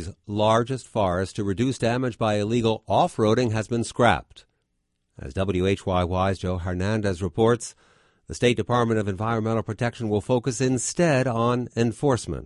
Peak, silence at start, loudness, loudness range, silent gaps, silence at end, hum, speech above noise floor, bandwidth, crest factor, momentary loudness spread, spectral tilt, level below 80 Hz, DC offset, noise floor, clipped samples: -4 dBFS; 0 s; -24 LUFS; 2 LU; none; 0 s; none; 51 dB; 11.5 kHz; 20 dB; 6 LU; -6 dB/octave; -44 dBFS; under 0.1%; -74 dBFS; under 0.1%